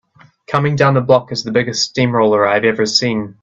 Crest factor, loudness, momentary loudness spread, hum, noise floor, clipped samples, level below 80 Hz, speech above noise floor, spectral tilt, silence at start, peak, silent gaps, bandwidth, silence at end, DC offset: 16 dB; -14 LUFS; 5 LU; none; -40 dBFS; under 0.1%; -52 dBFS; 26 dB; -5 dB/octave; 0.5 s; 0 dBFS; none; 8.2 kHz; 0.1 s; under 0.1%